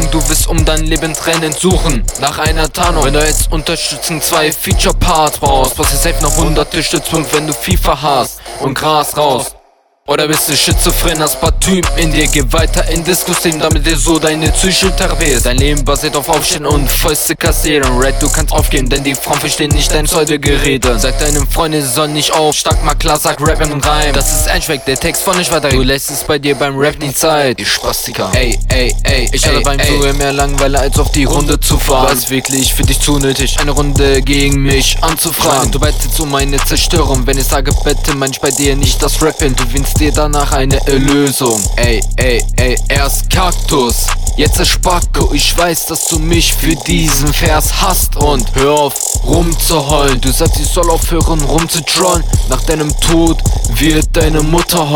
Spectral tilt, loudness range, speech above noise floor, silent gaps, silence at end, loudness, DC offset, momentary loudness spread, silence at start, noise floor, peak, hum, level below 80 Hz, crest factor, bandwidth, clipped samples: -3.5 dB/octave; 1 LU; 38 dB; none; 0 s; -11 LUFS; under 0.1%; 3 LU; 0 s; -49 dBFS; 0 dBFS; none; -16 dBFS; 10 dB; 19.5 kHz; under 0.1%